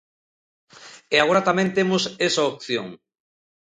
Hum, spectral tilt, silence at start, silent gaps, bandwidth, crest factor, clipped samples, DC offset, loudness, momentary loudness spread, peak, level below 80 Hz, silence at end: none; -4 dB/octave; 0.8 s; none; 9.8 kHz; 22 dB; under 0.1%; under 0.1%; -21 LUFS; 10 LU; -2 dBFS; -64 dBFS; 0.7 s